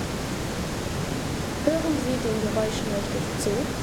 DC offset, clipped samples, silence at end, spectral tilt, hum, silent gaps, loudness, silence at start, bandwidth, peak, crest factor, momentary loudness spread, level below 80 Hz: under 0.1%; under 0.1%; 0 s; -5 dB/octave; none; none; -27 LUFS; 0 s; over 20 kHz; -8 dBFS; 18 dB; 5 LU; -40 dBFS